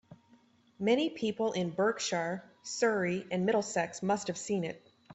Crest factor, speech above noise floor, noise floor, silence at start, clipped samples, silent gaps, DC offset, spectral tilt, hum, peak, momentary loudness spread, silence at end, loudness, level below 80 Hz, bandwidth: 18 dB; 33 dB; -65 dBFS; 0.1 s; under 0.1%; none; under 0.1%; -4.5 dB/octave; none; -16 dBFS; 8 LU; 0 s; -32 LUFS; -74 dBFS; 8.4 kHz